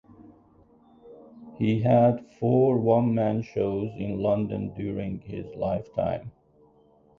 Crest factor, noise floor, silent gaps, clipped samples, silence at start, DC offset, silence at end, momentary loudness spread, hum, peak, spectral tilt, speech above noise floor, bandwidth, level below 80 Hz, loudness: 18 dB; -59 dBFS; none; under 0.1%; 0.2 s; under 0.1%; 0.9 s; 12 LU; none; -8 dBFS; -10 dB/octave; 35 dB; 6.6 kHz; -54 dBFS; -26 LUFS